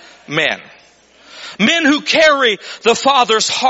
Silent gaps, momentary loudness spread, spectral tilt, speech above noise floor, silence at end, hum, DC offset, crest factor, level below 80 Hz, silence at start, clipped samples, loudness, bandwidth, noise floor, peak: none; 12 LU; -2.5 dB/octave; 34 dB; 0 s; none; under 0.1%; 16 dB; -56 dBFS; 0.3 s; under 0.1%; -13 LUFS; 8.2 kHz; -47 dBFS; 0 dBFS